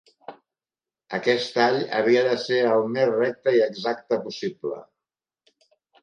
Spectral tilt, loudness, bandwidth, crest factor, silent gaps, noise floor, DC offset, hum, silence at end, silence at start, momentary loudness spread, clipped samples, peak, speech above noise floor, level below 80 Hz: -5 dB/octave; -23 LUFS; 9.6 kHz; 18 dB; none; under -90 dBFS; under 0.1%; none; 1.2 s; 0.3 s; 11 LU; under 0.1%; -6 dBFS; over 68 dB; -78 dBFS